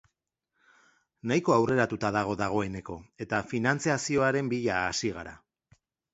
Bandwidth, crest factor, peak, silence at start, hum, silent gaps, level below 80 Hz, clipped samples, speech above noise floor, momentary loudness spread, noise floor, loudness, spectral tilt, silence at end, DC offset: 8.2 kHz; 20 dB; -10 dBFS; 1.25 s; none; none; -58 dBFS; under 0.1%; 55 dB; 15 LU; -83 dBFS; -28 LUFS; -5 dB/octave; 0.75 s; under 0.1%